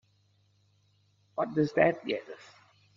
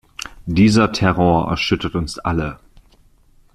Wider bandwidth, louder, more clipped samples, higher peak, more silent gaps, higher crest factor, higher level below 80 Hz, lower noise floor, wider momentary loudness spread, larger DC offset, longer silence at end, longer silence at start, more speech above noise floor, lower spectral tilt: second, 7.4 kHz vs 12.5 kHz; second, -30 LUFS vs -17 LUFS; neither; second, -10 dBFS vs -2 dBFS; neither; first, 22 dB vs 16 dB; second, -72 dBFS vs -38 dBFS; first, -69 dBFS vs -52 dBFS; first, 21 LU vs 13 LU; neither; second, 0.6 s vs 1 s; first, 1.35 s vs 0.2 s; first, 40 dB vs 36 dB; about the same, -5 dB/octave vs -6 dB/octave